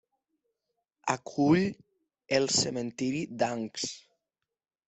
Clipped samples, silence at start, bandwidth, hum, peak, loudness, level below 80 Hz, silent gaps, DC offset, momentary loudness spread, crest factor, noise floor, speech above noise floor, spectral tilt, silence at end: under 0.1%; 1.05 s; 8.4 kHz; none; -10 dBFS; -29 LUFS; -68 dBFS; none; under 0.1%; 11 LU; 22 dB; -88 dBFS; 59 dB; -4 dB/octave; 0.9 s